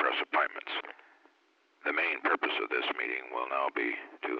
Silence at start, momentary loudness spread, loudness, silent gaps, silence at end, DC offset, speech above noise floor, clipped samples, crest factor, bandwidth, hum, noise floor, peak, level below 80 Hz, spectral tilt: 0 s; 9 LU; -31 LUFS; none; 0 s; under 0.1%; 37 dB; under 0.1%; 18 dB; 7 kHz; none; -69 dBFS; -16 dBFS; under -90 dBFS; -3 dB/octave